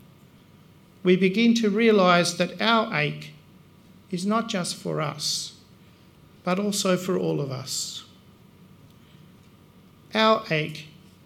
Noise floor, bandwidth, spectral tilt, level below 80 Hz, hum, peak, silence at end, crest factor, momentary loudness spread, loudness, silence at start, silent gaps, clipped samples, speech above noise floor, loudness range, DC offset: -53 dBFS; 16 kHz; -4.5 dB/octave; -68 dBFS; none; -4 dBFS; 0.4 s; 22 dB; 14 LU; -23 LUFS; 1.05 s; none; under 0.1%; 30 dB; 8 LU; under 0.1%